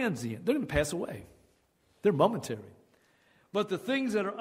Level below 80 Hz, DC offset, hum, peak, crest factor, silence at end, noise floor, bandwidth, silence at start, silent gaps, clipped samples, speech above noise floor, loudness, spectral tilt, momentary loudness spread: -54 dBFS; under 0.1%; none; -10 dBFS; 22 dB; 0 s; -69 dBFS; 16 kHz; 0 s; none; under 0.1%; 39 dB; -31 LUFS; -5.5 dB/octave; 13 LU